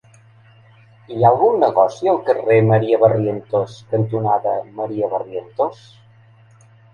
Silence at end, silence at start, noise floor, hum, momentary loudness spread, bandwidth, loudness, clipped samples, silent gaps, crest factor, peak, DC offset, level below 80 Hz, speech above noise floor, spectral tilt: 1.2 s; 1.1 s; -49 dBFS; none; 10 LU; 7.2 kHz; -17 LUFS; under 0.1%; none; 18 dB; 0 dBFS; under 0.1%; -58 dBFS; 32 dB; -8.5 dB/octave